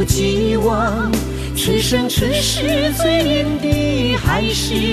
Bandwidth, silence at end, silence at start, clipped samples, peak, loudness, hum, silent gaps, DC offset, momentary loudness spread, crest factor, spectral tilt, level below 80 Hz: 14 kHz; 0 s; 0 s; under 0.1%; -2 dBFS; -17 LUFS; none; none; under 0.1%; 3 LU; 16 dB; -4.5 dB/octave; -28 dBFS